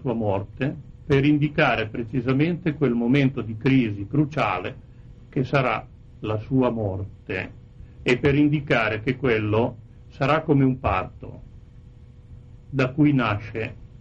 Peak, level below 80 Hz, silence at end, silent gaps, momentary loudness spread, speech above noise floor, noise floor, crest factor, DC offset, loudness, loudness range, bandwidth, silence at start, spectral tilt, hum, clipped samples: -6 dBFS; -46 dBFS; 0.05 s; none; 12 LU; 23 dB; -46 dBFS; 18 dB; under 0.1%; -23 LUFS; 4 LU; 7.6 kHz; 0 s; -8 dB/octave; none; under 0.1%